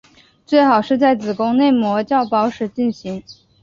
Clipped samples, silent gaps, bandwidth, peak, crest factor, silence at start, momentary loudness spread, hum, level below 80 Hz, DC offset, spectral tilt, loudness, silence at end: under 0.1%; none; 7.2 kHz; -2 dBFS; 16 dB; 0.5 s; 9 LU; none; -58 dBFS; under 0.1%; -6.5 dB/octave; -16 LUFS; 0.3 s